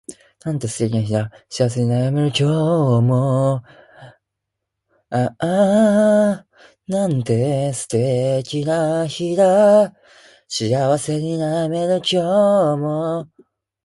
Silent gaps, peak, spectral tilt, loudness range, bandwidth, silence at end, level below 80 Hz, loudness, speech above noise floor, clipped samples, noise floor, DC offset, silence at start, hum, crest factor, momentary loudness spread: none; -4 dBFS; -6.5 dB/octave; 2 LU; 11.5 kHz; 0.6 s; -56 dBFS; -18 LUFS; 62 dB; under 0.1%; -80 dBFS; under 0.1%; 0.1 s; none; 14 dB; 11 LU